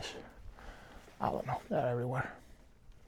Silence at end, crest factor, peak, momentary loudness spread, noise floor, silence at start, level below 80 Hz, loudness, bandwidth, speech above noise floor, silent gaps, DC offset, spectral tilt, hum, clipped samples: 0 s; 22 dB; -18 dBFS; 20 LU; -58 dBFS; 0 s; -58 dBFS; -37 LUFS; 16.5 kHz; 23 dB; none; under 0.1%; -6.5 dB/octave; none; under 0.1%